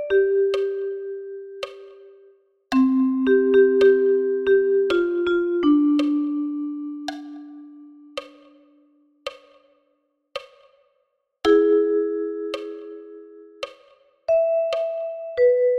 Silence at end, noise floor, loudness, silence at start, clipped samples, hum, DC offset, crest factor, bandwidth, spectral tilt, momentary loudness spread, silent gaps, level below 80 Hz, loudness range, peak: 0 s; -71 dBFS; -20 LUFS; 0 s; under 0.1%; none; under 0.1%; 16 dB; 8.2 kHz; -5 dB/octave; 20 LU; none; -60 dBFS; 21 LU; -6 dBFS